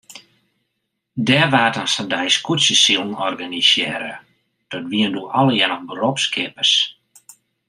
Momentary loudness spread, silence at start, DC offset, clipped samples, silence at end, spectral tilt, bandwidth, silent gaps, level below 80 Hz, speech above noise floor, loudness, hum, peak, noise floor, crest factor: 10 LU; 0.1 s; under 0.1%; under 0.1%; 0.75 s; -3 dB/octave; 15 kHz; none; -66 dBFS; 57 dB; -17 LUFS; none; -2 dBFS; -75 dBFS; 18 dB